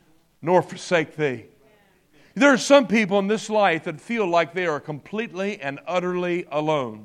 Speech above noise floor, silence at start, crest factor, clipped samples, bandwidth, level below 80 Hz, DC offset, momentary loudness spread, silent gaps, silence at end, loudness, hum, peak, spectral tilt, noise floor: 36 dB; 0.4 s; 20 dB; under 0.1%; 12.5 kHz; -70 dBFS; under 0.1%; 14 LU; none; 0 s; -22 LUFS; none; -2 dBFS; -5 dB/octave; -58 dBFS